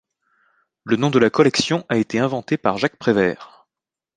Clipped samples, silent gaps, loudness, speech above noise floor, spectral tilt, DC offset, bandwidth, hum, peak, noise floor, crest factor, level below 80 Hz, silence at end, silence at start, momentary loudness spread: under 0.1%; none; -19 LUFS; 69 dB; -5.5 dB/octave; under 0.1%; 9.8 kHz; none; 0 dBFS; -88 dBFS; 20 dB; -58 dBFS; 0.7 s; 0.85 s; 7 LU